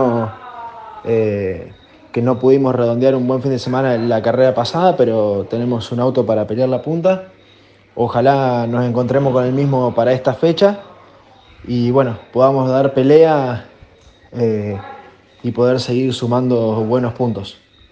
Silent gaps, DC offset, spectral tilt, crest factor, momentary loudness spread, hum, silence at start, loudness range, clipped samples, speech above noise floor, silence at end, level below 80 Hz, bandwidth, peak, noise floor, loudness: none; under 0.1%; -8 dB/octave; 16 dB; 12 LU; none; 0 s; 3 LU; under 0.1%; 33 dB; 0.4 s; -54 dBFS; 8.8 kHz; 0 dBFS; -48 dBFS; -16 LUFS